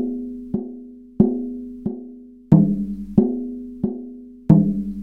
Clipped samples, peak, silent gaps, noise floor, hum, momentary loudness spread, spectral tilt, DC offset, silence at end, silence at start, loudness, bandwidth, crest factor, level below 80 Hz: under 0.1%; 0 dBFS; none; -40 dBFS; none; 20 LU; -12.5 dB/octave; under 0.1%; 0 s; 0 s; -21 LUFS; 2.3 kHz; 20 dB; -46 dBFS